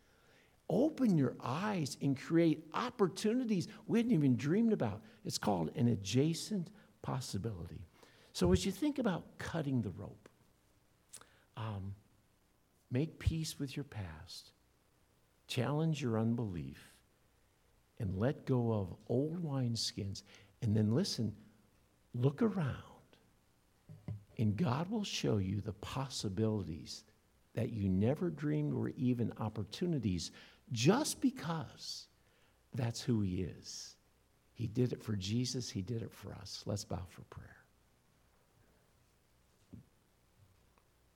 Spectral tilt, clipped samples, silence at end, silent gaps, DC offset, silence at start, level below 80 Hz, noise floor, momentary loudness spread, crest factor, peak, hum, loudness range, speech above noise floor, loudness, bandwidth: -6 dB/octave; under 0.1%; 1.35 s; none; under 0.1%; 0.7 s; -60 dBFS; -73 dBFS; 16 LU; 22 dB; -16 dBFS; none; 9 LU; 37 dB; -37 LUFS; 16.5 kHz